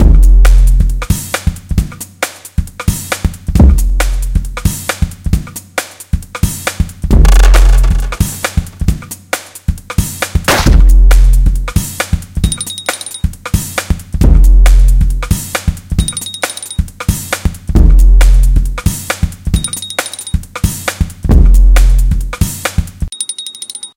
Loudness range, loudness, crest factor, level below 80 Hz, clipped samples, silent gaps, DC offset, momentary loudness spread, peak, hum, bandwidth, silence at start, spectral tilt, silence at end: 2 LU; -13 LUFS; 10 dB; -10 dBFS; 2%; none; under 0.1%; 11 LU; 0 dBFS; none; 16.5 kHz; 0 s; -4.5 dB/octave; 0.1 s